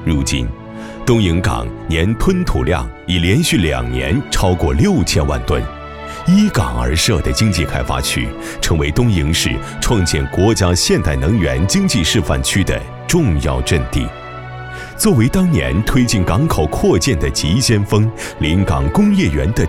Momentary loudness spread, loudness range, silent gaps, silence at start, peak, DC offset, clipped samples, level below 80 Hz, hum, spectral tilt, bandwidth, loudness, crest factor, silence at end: 8 LU; 2 LU; none; 0 s; 0 dBFS; 0.3%; under 0.1%; -24 dBFS; none; -5 dB/octave; 16.5 kHz; -15 LUFS; 14 dB; 0 s